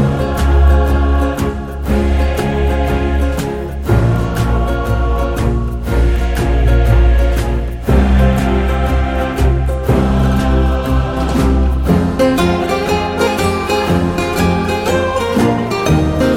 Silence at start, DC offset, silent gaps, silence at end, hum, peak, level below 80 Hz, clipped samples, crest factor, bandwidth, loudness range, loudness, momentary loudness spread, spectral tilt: 0 s; under 0.1%; none; 0 s; none; 0 dBFS; -16 dBFS; under 0.1%; 12 dB; 15.5 kHz; 2 LU; -15 LUFS; 5 LU; -7 dB/octave